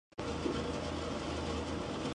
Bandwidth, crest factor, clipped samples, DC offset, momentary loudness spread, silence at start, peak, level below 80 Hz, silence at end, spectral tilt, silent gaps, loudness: 11 kHz; 14 dB; under 0.1%; under 0.1%; 2 LU; 0.15 s; -22 dBFS; -48 dBFS; 0 s; -5.5 dB/octave; none; -38 LUFS